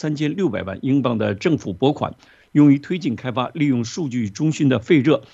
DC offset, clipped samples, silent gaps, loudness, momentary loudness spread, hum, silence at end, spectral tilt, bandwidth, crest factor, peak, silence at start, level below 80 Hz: under 0.1%; under 0.1%; none; -20 LUFS; 9 LU; none; 0.1 s; -7 dB/octave; 7.8 kHz; 16 dB; -4 dBFS; 0 s; -58 dBFS